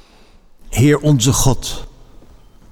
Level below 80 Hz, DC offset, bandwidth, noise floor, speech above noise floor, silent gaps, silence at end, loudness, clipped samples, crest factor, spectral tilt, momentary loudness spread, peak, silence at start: -30 dBFS; under 0.1%; 18.5 kHz; -46 dBFS; 32 dB; none; 0.8 s; -15 LUFS; under 0.1%; 14 dB; -5 dB/octave; 13 LU; -4 dBFS; 0.65 s